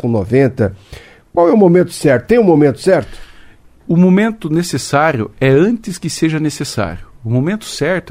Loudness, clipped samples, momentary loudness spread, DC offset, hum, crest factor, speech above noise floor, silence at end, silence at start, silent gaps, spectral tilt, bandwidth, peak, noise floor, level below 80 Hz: -13 LUFS; under 0.1%; 10 LU; under 0.1%; none; 14 dB; 28 dB; 0 s; 0.05 s; none; -6.5 dB/octave; 16 kHz; 0 dBFS; -41 dBFS; -42 dBFS